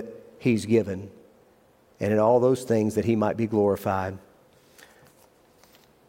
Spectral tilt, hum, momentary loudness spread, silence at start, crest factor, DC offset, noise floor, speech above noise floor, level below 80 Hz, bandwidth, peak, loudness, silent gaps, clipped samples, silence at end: -7 dB/octave; none; 15 LU; 0 s; 18 dB; under 0.1%; -59 dBFS; 36 dB; -66 dBFS; 16.5 kHz; -8 dBFS; -24 LUFS; none; under 0.1%; 1.9 s